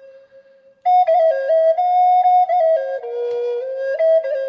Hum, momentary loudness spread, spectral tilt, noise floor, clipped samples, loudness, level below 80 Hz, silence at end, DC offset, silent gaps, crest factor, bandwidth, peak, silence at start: none; 10 LU; -2 dB/octave; -49 dBFS; under 0.1%; -17 LUFS; -82 dBFS; 0 s; under 0.1%; none; 10 dB; 5.8 kHz; -8 dBFS; 0.85 s